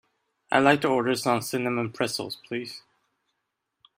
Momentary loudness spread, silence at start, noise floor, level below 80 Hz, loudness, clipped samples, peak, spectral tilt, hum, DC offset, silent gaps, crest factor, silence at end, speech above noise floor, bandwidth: 13 LU; 0.5 s; -80 dBFS; -68 dBFS; -25 LUFS; under 0.1%; -4 dBFS; -4.5 dB/octave; none; under 0.1%; none; 24 dB; 1.2 s; 55 dB; 16 kHz